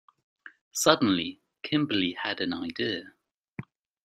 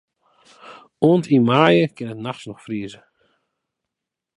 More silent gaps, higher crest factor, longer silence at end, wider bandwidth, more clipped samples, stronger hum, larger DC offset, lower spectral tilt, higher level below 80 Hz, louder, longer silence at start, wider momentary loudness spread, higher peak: first, 0.61-0.71 s, 3.38-3.43 s vs none; first, 26 dB vs 20 dB; second, 0.4 s vs 1.45 s; first, 15 kHz vs 11 kHz; neither; neither; neither; second, -3.5 dB/octave vs -7.5 dB/octave; about the same, -68 dBFS vs -66 dBFS; second, -27 LUFS vs -19 LUFS; second, 0.45 s vs 0.7 s; first, 22 LU vs 16 LU; second, -4 dBFS vs 0 dBFS